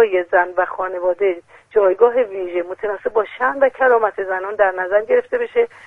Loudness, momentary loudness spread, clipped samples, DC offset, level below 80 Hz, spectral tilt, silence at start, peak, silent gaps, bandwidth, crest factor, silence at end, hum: -18 LUFS; 8 LU; under 0.1%; under 0.1%; -58 dBFS; -6 dB/octave; 0 s; 0 dBFS; none; 3.9 kHz; 16 dB; 0 s; none